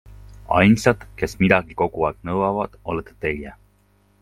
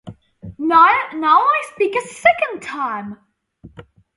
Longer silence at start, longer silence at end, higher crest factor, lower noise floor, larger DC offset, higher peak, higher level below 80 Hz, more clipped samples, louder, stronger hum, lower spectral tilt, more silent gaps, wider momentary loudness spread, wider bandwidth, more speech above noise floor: about the same, 0.1 s vs 0.05 s; first, 0.7 s vs 0.35 s; about the same, 22 dB vs 18 dB; first, -59 dBFS vs -46 dBFS; neither; about the same, 0 dBFS vs 0 dBFS; first, -44 dBFS vs -56 dBFS; neither; second, -21 LUFS vs -16 LUFS; first, 50 Hz at -45 dBFS vs none; first, -6.5 dB/octave vs -4.5 dB/octave; neither; about the same, 13 LU vs 13 LU; first, 14 kHz vs 11.5 kHz; first, 39 dB vs 30 dB